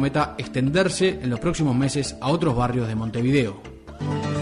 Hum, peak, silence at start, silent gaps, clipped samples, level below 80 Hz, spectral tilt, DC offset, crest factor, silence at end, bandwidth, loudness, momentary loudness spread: none; -8 dBFS; 0 s; none; under 0.1%; -42 dBFS; -6 dB/octave; under 0.1%; 14 dB; 0 s; 11 kHz; -23 LUFS; 8 LU